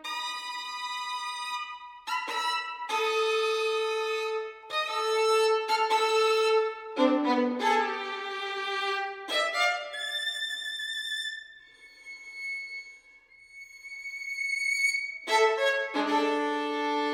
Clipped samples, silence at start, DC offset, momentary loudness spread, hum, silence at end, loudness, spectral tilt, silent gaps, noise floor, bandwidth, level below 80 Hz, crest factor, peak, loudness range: under 0.1%; 0 s; under 0.1%; 13 LU; none; 0 s; -28 LUFS; -0.5 dB/octave; none; -56 dBFS; 16.5 kHz; -78 dBFS; 18 dB; -10 dBFS; 9 LU